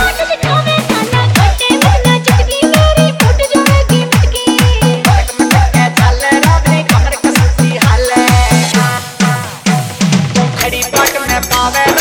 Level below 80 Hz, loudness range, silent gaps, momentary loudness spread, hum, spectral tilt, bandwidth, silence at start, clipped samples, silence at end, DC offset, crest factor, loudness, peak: -18 dBFS; 2 LU; none; 4 LU; none; -4.5 dB/octave; over 20 kHz; 0 s; 0.2%; 0 s; under 0.1%; 10 dB; -10 LUFS; 0 dBFS